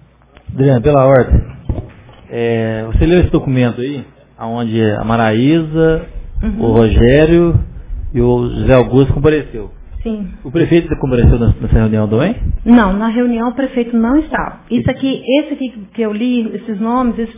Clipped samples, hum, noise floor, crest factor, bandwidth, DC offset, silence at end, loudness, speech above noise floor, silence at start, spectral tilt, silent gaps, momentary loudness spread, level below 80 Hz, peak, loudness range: under 0.1%; none; -36 dBFS; 12 dB; 3.8 kHz; under 0.1%; 0 s; -13 LUFS; 24 dB; 0.5 s; -12 dB/octave; none; 14 LU; -22 dBFS; 0 dBFS; 4 LU